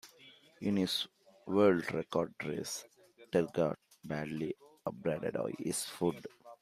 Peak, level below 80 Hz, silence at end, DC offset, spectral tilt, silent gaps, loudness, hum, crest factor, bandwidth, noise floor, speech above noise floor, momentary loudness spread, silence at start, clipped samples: -16 dBFS; -72 dBFS; 0.05 s; under 0.1%; -5 dB/octave; none; -35 LUFS; none; 20 dB; 15.5 kHz; -60 dBFS; 26 dB; 14 LU; 0.05 s; under 0.1%